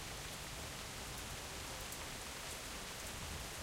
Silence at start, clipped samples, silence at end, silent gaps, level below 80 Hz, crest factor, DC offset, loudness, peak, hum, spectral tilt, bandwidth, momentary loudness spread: 0 s; under 0.1%; 0 s; none; -56 dBFS; 16 dB; under 0.1%; -45 LUFS; -30 dBFS; none; -2 dB/octave; 16 kHz; 1 LU